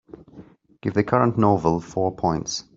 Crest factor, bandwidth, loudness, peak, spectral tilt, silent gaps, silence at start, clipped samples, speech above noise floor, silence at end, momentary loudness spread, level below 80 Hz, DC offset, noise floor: 20 dB; 7.8 kHz; -22 LUFS; -2 dBFS; -6 dB/octave; none; 0.35 s; under 0.1%; 26 dB; 0.15 s; 7 LU; -52 dBFS; under 0.1%; -47 dBFS